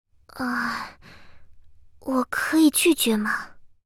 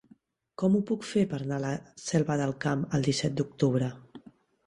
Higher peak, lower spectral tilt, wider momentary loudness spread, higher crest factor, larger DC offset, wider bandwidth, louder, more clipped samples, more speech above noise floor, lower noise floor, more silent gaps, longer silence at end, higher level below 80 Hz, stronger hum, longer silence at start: first, -8 dBFS vs -12 dBFS; second, -2.5 dB/octave vs -6 dB/octave; first, 18 LU vs 8 LU; about the same, 18 dB vs 18 dB; neither; first, 19 kHz vs 11.5 kHz; first, -23 LUFS vs -29 LUFS; neither; second, 25 dB vs 33 dB; second, -47 dBFS vs -61 dBFS; neither; second, 0.2 s vs 0.5 s; first, -56 dBFS vs -62 dBFS; neither; second, 0.35 s vs 0.6 s